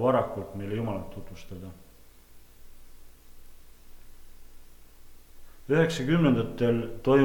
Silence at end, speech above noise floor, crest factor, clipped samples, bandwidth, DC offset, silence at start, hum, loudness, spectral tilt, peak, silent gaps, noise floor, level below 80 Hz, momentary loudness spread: 0 s; 26 dB; 20 dB; under 0.1%; 19 kHz; under 0.1%; 0 s; none; -27 LUFS; -7 dB/octave; -10 dBFS; none; -52 dBFS; -50 dBFS; 20 LU